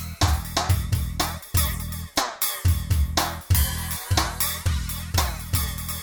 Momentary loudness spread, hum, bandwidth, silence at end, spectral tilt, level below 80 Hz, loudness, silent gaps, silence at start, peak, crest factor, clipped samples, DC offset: 5 LU; none; over 20 kHz; 0 s; -3.5 dB/octave; -30 dBFS; -24 LUFS; none; 0 s; -6 dBFS; 18 dB; under 0.1%; under 0.1%